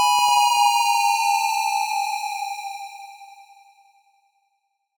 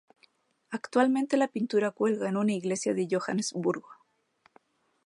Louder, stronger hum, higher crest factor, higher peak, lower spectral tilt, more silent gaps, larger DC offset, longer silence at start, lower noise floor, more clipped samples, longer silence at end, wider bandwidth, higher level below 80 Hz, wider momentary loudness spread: first, -20 LUFS vs -29 LUFS; neither; second, 14 dB vs 20 dB; about the same, -8 dBFS vs -10 dBFS; second, 4.5 dB/octave vs -5 dB/octave; neither; neither; second, 0 s vs 0.7 s; first, -73 dBFS vs -68 dBFS; neither; first, 1.7 s vs 1.1 s; first, over 20 kHz vs 11.5 kHz; first, -74 dBFS vs -80 dBFS; first, 19 LU vs 6 LU